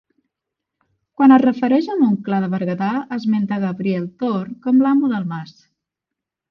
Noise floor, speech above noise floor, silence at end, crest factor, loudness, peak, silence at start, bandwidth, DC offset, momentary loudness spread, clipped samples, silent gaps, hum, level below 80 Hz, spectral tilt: -84 dBFS; 67 dB; 1.05 s; 18 dB; -18 LUFS; -2 dBFS; 1.2 s; 6 kHz; under 0.1%; 10 LU; under 0.1%; none; none; -64 dBFS; -9 dB/octave